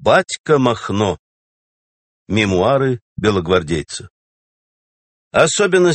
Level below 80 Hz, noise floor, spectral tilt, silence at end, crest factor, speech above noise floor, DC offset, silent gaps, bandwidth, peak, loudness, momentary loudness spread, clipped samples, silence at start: -46 dBFS; under -90 dBFS; -5 dB/octave; 0 s; 18 dB; over 75 dB; under 0.1%; 0.39-0.44 s, 1.19-2.26 s, 3.01-3.16 s, 4.10-5.31 s; 8.8 kHz; 0 dBFS; -16 LUFS; 9 LU; under 0.1%; 0 s